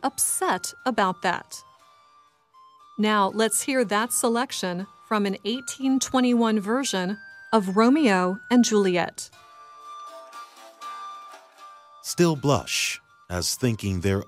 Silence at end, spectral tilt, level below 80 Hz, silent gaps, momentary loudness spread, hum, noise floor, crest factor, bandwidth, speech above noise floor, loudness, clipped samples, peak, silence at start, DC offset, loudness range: 0.05 s; -4 dB/octave; -58 dBFS; none; 21 LU; none; -59 dBFS; 18 dB; 16 kHz; 35 dB; -23 LUFS; under 0.1%; -6 dBFS; 0 s; under 0.1%; 6 LU